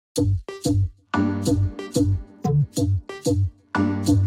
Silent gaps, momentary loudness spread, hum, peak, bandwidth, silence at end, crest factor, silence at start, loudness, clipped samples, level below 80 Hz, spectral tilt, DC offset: none; 3 LU; none; -8 dBFS; 15.5 kHz; 0 s; 14 dB; 0.15 s; -24 LUFS; under 0.1%; -38 dBFS; -6.5 dB/octave; under 0.1%